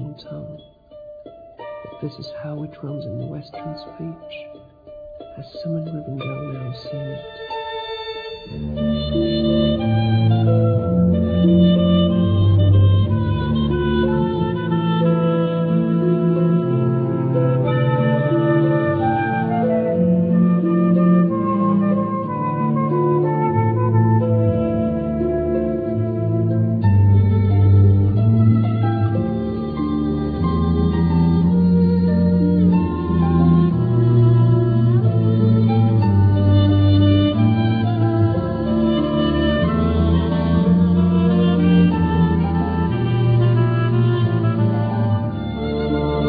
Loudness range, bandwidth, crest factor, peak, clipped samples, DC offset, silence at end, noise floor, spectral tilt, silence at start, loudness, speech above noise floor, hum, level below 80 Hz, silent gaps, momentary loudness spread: 15 LU; 4.9 kHz; 14 dB; -4 dBFS; under 0.1%; under 0.1%; 0 s; -42 dBFS; -11.5 dB/octave; 0 s; -17 LUFS; 17 dB; none; -36 dBFS; none; 15 LU